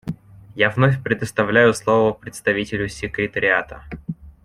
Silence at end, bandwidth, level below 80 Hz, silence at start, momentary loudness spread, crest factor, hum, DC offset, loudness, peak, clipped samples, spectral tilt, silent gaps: 0.15 s; 14 kHz; -46 dBFS; 0.05 s; 18 LU; 18 dB; none; under 0.1%; -19 LUFS; -2 dBFS; under 0.1%; -6 dB/octave; none